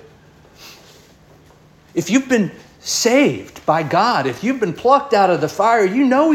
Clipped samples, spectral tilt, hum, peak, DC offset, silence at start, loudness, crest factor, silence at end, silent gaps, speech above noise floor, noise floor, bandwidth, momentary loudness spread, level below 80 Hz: under 0.1%; -4.5 dB/octave; none; -2 dBFS; under 0.1%; 0.6 s; -16 LUFS; 16 dB; 0 s; none; 32 dB; -48 dBFS; 16.5 kHz; 9 LU; -58 dBFS